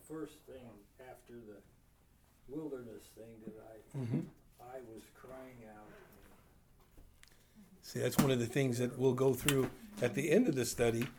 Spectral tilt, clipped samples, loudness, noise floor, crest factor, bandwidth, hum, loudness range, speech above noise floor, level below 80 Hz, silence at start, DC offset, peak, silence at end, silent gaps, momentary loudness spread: -5.5 dB/octave; under 0.1%; -35 LUFS; -67 dBFS; 24 dB; over 20 kHz; none; 20 LU; 30 dB; -62 dBFS; 0.1 s; under 0.1%; -14 dBFS; 0 s; none; 24 LU